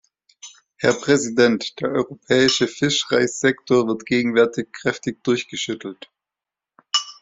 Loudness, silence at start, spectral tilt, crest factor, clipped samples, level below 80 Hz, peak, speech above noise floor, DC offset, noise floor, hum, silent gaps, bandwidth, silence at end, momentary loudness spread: -20 LUFS; 0.45 s; -3.5 dB/octave; 18 dB; under 0.1%; -60 dBFS; -2 dBFS; 68 dB; under 0.1%; -88 dBFS; none; none; 8 kHz; 0.1 s; 8 LU